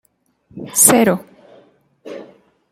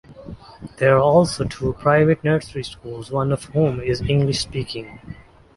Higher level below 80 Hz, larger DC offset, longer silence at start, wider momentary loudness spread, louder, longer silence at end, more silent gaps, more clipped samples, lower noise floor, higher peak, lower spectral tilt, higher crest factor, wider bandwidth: second, -58 dBFS vs -42 dBFS; neither; first, 0.55 s vs 0.1 s; about the same, 25 LU vs 23 LU; first, -12 LUFS vs -19 LUFS; about the same, 0.5 s vs 0.45 s; neither; neither; first, -57 dBFS vs -39 dBFS; about the same, 0 dBFS vs -2 dBFS; second, -3 dB/octave vs -6 dB/octave; about the same, 20 dB vs 18 dB; first, 17 kHz vs 11.5 kHz